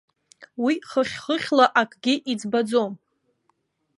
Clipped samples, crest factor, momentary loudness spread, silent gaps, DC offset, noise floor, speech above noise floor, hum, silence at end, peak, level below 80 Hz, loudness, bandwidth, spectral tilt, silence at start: under 0.1%; 22 dB; 10 LU; none; under 0.1%; -70 dBFS; 48 dB; none; 1 s; -4 dBFS; -70 dBFS; -23 LUFS; 11.5 kHz; -4 dB/octave; 0.4 s